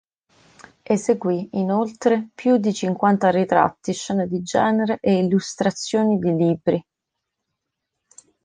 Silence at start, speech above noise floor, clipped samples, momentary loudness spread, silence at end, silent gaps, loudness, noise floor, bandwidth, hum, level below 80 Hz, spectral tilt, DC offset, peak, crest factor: 0.9 s; 62 dB; under 0.1%; 6 LU; 1.65 s; none; -21 LUFS; -81 dBFS; 9.8 kHz; none; -60 dBFS; -6 dB/octave; under 0.1%; -2 dBFS; 18 dB